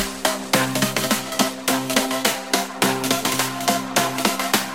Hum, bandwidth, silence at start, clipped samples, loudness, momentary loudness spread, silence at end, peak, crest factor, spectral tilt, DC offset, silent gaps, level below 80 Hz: none; 17 kHz; 0 s; under 0.1%; -20 LUFS; 3 LU; 0 s; 0 dBFS; 22 dB; -2.5 dB/octave; 0.3%; none; -54 dBFS